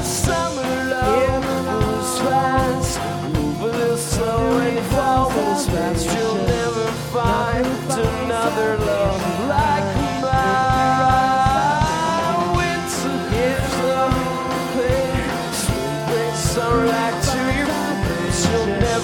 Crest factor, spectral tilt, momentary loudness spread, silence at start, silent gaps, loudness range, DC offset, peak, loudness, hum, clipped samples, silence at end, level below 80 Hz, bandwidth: 16 dB; -5 dB/octave; 5 LU; 0 s; none; 2 LU; under 0.1%; -4 dBFS; -19 LUFS; none; under 0.1%; 0 s; -32 dBFS; 18.5 kHz